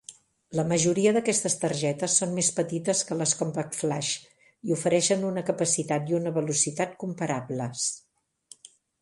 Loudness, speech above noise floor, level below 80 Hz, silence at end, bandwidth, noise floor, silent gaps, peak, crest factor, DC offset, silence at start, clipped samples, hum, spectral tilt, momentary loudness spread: -26 LUFS; 29 dB; -66 dBFS; 1 s; 11.5 kHz; -55 dBFS; none; -10 dBFS; 18 dB; under 0.1%; 0.1 s; under 0.1%; none; -4 dB/octave; 8 LU